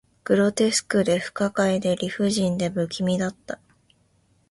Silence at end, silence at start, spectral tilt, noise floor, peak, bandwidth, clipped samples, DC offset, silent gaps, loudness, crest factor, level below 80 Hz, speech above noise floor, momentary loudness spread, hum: 0.95 s; 0.25 s; -5 dB/octave; -63 dBFS; -6 dBFS; 11.5 kHz; under 0.1%; under 0.1%; none; -23 LUFS; 18 dB; -58 dBFS; 41 dB; 8 LU; none